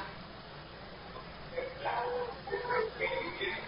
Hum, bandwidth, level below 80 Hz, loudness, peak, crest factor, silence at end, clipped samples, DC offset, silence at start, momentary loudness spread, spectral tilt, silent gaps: none; 5.4 kHz; -58 dBFS; -37 LUFS; -20 dBFS; 18 dB; 0 s; under 0.1%; under 0.1%; 0 s; 14 LU; -2 dB/octave; none